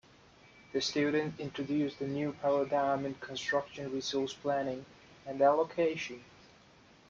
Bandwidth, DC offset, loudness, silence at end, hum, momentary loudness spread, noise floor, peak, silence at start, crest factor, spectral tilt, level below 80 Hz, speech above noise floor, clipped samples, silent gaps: 7.6 kHz; under 0.1%; -33 LUFS; 0.85 s; none; 10 LU; -60 dBFS; -16 dBFS; 0.75 s; 18 dB; -5 dB/octave; -70 dBFS; 28 dB; under 0.1%; none